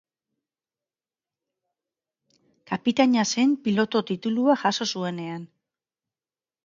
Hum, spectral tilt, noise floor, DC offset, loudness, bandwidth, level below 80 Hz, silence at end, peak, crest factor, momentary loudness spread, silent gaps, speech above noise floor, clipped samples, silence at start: none; -4.5 dB/octave; under -90 dBFS; under 0.1%; -24 LUFS; 7.6 kHz; -72 dBFS; 1.2 s; -6 dBFS; 22 dB; 12 LU; none; over 67 dB; under 0.1%; 2.7 s